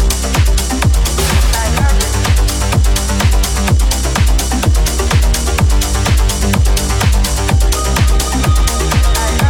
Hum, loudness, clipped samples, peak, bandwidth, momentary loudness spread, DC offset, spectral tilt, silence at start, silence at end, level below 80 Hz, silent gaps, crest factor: none; -13 LUFS; under 0.1%; 0 dBFS; 18 kHz; 1 LU; under 0.1%; -4 dB/octave; 0 s; 0 s; -14 dBFS; none; 10 dB